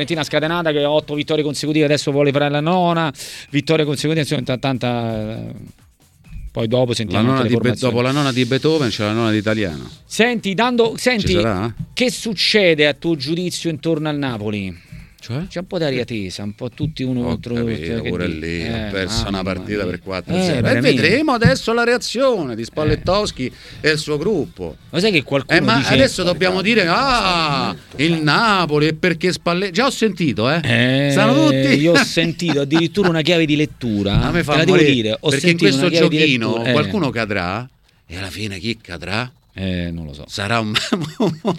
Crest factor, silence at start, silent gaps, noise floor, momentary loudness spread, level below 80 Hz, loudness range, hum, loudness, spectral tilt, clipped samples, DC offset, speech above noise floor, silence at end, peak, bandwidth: 18 dB; 0 s; none; -45 dBFS; 12 LU; -40 dBFS; 8 LU; none; -17 LUFS; -5 dB/octave; under 0.1%; under 0.1%; 28 dB; 0 s; 0 dBFS; 16 kHz